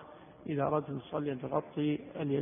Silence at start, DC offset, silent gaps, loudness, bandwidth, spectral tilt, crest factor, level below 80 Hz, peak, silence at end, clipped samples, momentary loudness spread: 0 s; under 0.1%; none; -35 LUFS; 3.7 kHz; -6 dB/octave; 18 dB; -68 dBFS; -18 dBFS; 0 s; under 0.1%; 7 LU